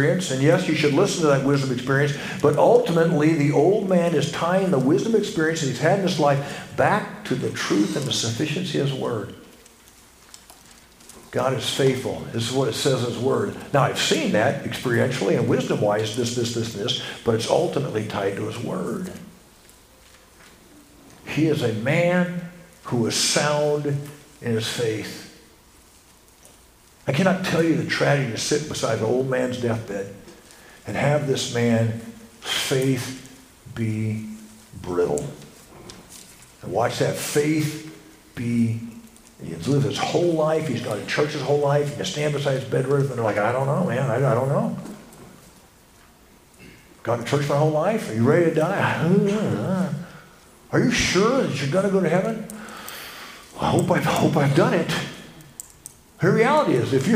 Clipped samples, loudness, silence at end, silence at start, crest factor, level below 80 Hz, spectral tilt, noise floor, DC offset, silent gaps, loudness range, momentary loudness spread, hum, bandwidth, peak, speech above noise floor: under 0.1%; -22 LUFS; 0 s; 0 s; 20 dB; -54 dBFS; -5.5 dB/octave; -52 dBFS; under 0.1%; none; 8 LU; 16 LU; none; 15.5 kHz; -2 dBFS; 31 dB